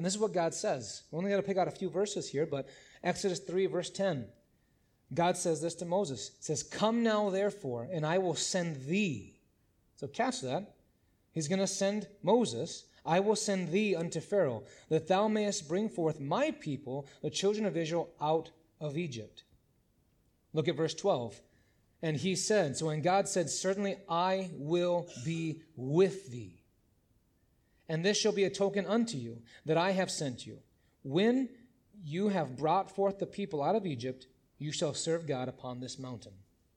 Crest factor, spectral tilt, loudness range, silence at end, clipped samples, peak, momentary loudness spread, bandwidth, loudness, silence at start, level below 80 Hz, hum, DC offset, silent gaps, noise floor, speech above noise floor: 18 dB; -4.5 dB/octave; 4 LU; 0.4 s; under 0.1%; -14 dBFS; 12 LU; 13 kHz; -33 LUFS; 0 s; -72 dBFS; none; under 0.1%; none; -72 dBFS; 39 dB